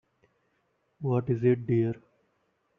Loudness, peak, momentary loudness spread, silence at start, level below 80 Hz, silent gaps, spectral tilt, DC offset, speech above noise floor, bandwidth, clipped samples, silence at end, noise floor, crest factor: -28 LUFS; -12 dBFS; 10 LU; 1 s; -66 dBFS; none; -10 dB/octave; under 0.1%; 48 dB; 3.7 kHz; under 0.1%; 0.8 s; -74 dBFS; 18 dB